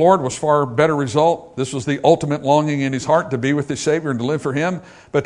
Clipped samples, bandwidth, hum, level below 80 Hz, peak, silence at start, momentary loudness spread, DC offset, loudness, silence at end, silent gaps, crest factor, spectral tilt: under 0.1%; 11 kHz; none; -56 dBFS; 0 dBFS; 0 s; 7 LU; under 0.1%; -18 LUFS; 0 s; none; 18 dB; -6 dB/octave